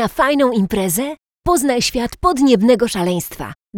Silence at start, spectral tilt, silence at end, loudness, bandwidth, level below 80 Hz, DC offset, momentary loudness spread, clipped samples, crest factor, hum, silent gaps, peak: 0 s; -4.5 dB/octave; 0 s; -16 LUFS; 19.5 kHz; -38 dBFS; under 0.1%; 11 LU; under 0.1%; 16 dB; none; none; 0 dBFS